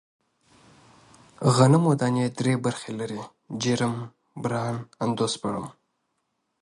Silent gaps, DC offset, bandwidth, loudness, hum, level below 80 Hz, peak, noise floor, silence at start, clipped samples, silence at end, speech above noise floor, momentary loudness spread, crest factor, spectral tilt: none; under 0.1%; 11.5 kHz; -25 LUFS; none; -64 dBFS; -6 dBFS; -76 dBFS; 1.4 s; under 0.1%; 0.9 s; 52 dB; 16 LU; 20 dB; -6 dB/octave